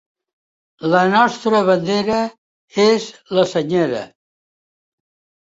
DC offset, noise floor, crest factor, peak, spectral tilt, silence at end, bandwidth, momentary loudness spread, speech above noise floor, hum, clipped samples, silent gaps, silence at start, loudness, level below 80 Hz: under 0.1%; under -90 dBFS; 18 dB; -2 dBFS; -5.5 dB/octave; 1.35 s; 8 kHz; 12 LU; over 74 dB; none; under 0.1%; 2.38-2.68 s; 0.8 s; -17 LUFS; -60 dBFS